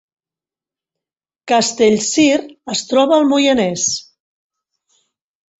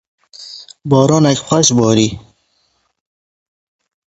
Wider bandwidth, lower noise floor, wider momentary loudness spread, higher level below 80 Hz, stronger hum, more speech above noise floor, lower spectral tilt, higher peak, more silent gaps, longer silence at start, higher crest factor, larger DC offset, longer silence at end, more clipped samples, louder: about the same, 8.2 kHz vs 8.2 kHz; first, under -90 dBFS vs -62 dBFS; second, 8 LU vs 21 LU; second, -58 dBFS vs -48 dBFS; neither; first, over 76 dB vs 51 dB; second, -3 dB/octave vs -5 dB/octave; about the same, -2 dBFS vs 0 dBFS; neither; first, 1.45 s vs 0.4 s; about the same, 16 dB vs 16 dB; neither; second, 1.6 s vs 1.95 s; neither; second, -15 LUFS vs -12 LUFS